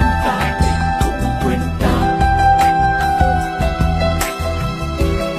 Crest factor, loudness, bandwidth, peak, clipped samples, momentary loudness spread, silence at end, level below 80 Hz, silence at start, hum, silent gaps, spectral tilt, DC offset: 14 dB; -16 LUFS; 15 kHz; -2 dBFS; under 0.1%; 7 LU; 0 s; -22 dBFS; 0 s; none; none; -6 dB/octave; under 0.1%